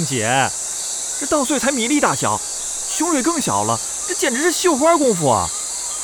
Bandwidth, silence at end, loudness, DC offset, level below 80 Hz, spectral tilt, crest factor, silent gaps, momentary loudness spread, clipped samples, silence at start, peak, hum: 19.5 kHz; 0 s; -18 LUFS; under 0.1%; -50 dBFS; -3 dB/octave; 18 dB; none; 7 LU; under 0.1%; 0 s; -2 dBFS; none